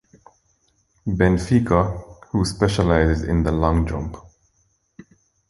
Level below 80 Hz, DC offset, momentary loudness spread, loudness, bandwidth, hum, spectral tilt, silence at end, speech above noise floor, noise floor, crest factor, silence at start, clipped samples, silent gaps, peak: -30 dBFS; under 0.1%; 14 LU; -20 LUFS; 11.5 kHz; none; -7 dB/octave; 1.3 s; 47 dB; -66 dBFS; 20 dB; 1.05 s; under 0.1%; none; -2 dBFS